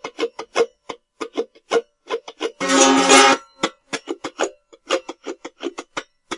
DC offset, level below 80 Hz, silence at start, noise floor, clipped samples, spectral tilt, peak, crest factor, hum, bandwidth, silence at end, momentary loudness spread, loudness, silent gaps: under 0.1%; -66 dBFS; 0.05 s; -39 dBFS; under 0.1%; -1 dB/octave; 0 dBFS; 20 dB; none; 11.5 kHz; 0 s; 22 LU; -19 LUFS; none